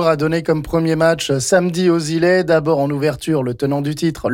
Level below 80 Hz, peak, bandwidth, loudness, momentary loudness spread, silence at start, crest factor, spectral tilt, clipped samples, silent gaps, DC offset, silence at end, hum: -44 dBFS; -4 dBFS; 17 kHz; -17 LUFS; 5 LU; 0 s; 12 dB; -5.5 dB/octave; under 0.1%; none; under 0.1%; 0 s; none